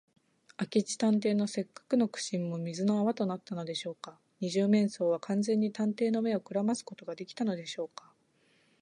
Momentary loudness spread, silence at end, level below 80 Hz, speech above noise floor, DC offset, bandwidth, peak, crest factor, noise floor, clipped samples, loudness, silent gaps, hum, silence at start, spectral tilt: 14 LU; 0.95 s; -82 dBFS; 38 dB; under 0.1%; 10.5 kHz; -14 dBFS; 18 dB; -69 dBFS; under 0.1%; -32 LUFS; none; none; 0.6 s; -5.5 dB/octave